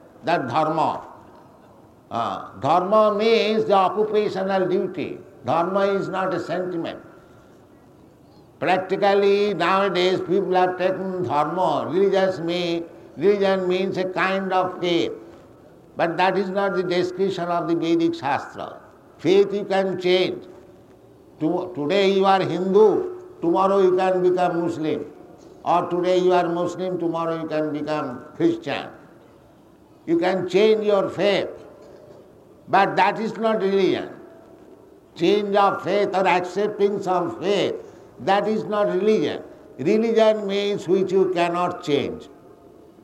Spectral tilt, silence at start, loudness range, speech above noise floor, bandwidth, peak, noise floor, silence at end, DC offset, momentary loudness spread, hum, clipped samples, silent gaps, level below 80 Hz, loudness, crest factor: -6 dB/octave; 0.25 s; 4 LU; 30 dB; 11 kHz; -4 dBFS; -51 dBFS; 0.7 s; under 0.1%; 10 LU; none; under 0.1%; none; -64 dBFS; -21 LUFS; 18 dB